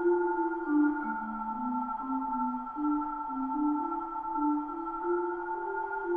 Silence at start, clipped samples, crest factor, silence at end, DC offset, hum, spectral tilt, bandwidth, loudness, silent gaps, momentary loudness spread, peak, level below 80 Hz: 0 s; under 0.1%; 14 dB; 0 s; under 0.1%; none; -9.5 dB/octave; 3.4 kHz; -32 LUFS; none; 7 LU; -18 dBFS; -60 dBFS